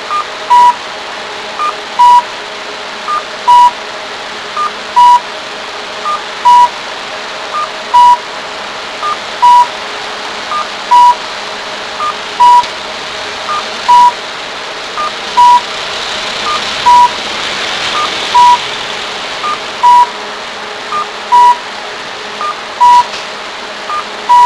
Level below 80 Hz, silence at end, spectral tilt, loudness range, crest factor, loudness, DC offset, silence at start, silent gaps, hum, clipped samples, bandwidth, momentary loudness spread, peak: -48 dBFS; 0 s; -1 dB/octave; 1 LU; 10 dB; -11 LUFS; under 0.1%; 0 s; none; none; 0.9%; 11 kHz; 14 LU; 0 dBFS